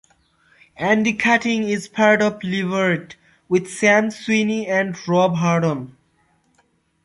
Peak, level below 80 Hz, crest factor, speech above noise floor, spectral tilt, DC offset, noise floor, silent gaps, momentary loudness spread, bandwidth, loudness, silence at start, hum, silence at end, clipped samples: -2 dBFS; -62 dBFS; 18 dB; 44 dB; -5.5 dB/octave; under 0.1%; -63 dBFS; none; 8 LU; 11.5 kHz; -19 LUFS; 0.8 s; none; 1.15 s; under 0.1%